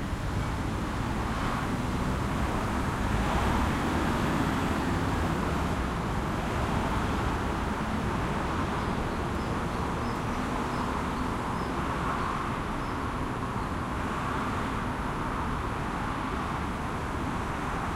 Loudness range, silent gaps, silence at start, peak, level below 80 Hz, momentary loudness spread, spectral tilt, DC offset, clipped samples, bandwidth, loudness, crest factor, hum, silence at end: 3 LU; none; 0 s; -14 dBFS; -38 dBFS; 4 LU; -6 dB/octave; under 0.1%; under 0.1%; 16 kHz; -30 LUFS; 16 dB; none; 0 s